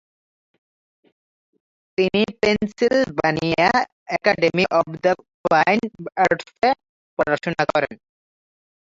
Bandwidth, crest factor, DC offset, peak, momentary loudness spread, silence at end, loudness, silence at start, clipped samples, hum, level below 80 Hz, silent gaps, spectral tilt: 7.8 kHz; 20 dB; under 0.1%; -2 dBFS; 7 LU; 1.05 s; -20 LUFS; 2 s; under 0.1%; none; -54 dBFS; 3.92-4.06 s, 5.34-5.44 s, 6.89-7.17 s; -5.5 dB/octave